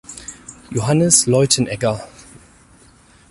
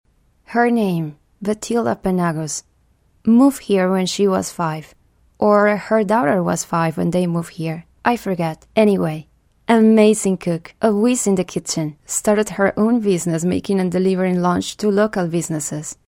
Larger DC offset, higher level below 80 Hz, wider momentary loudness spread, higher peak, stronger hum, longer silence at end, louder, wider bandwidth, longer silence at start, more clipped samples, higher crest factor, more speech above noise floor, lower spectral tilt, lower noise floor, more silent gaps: neither; about the same, -50 dBFS vs -52 dBFS; first, 22 LU vs 10 LU; about the same, 0 dBFS vs 0 dBFS; neither; first, 1.25 s vs 0.15 s; first, -15 LUFS vs -18 LUFS; second, 14 kHz vs 16.5 kHz; second, 0.1 s vs 0.5 s; neither; about the same, 20 dB vs 18 dB; second, 33 dB vs 41 dB; second, -4 dB/octave vs -5.5 dB/octave; second, -49 dBFS vs -58 dBFS; neither